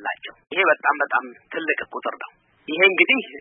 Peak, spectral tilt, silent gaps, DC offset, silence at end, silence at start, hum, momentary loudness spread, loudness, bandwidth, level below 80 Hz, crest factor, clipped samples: 0 dBFS; -7.5 dB/octave; none; under 0.1%; 0 s; 0 s; none; 17 LU; -20 LUFS; 3.7 kHz; -72 dBFS; 22 dB; under 0.1%